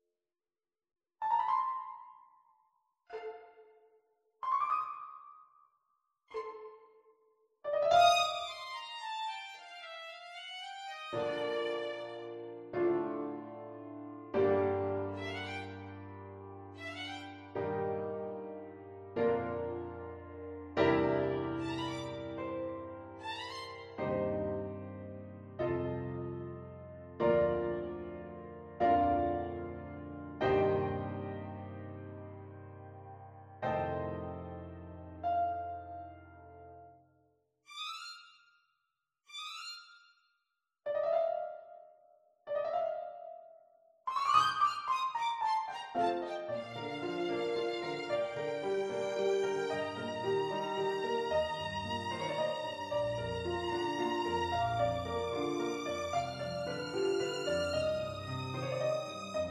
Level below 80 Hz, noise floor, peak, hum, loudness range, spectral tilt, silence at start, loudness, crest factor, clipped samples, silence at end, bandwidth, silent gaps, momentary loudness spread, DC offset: -62 dBFS; under -90 dBFS; -14 dBFS; none; 8 LU; -5.5 dB/octave; 1.2 s; -35 LUFS; 22 dB; under 0.1%; 0 s; 13 kHz; none; 18 LU; under 0.1%